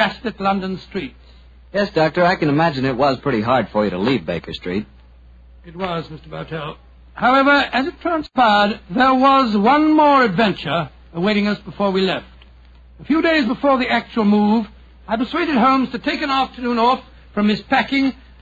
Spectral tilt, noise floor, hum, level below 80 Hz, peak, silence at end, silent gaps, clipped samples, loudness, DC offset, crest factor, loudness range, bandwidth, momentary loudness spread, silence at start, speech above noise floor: -7 dB/octave; -45 dBFS; none; -46 dBFS; -2 dBFS; 0.3 s; none; under 0.1%; -17 LUFS; under 0.1%; 16 dB; 6 LU; 7.8 kHz; 13 LU; 0 s; 27 dB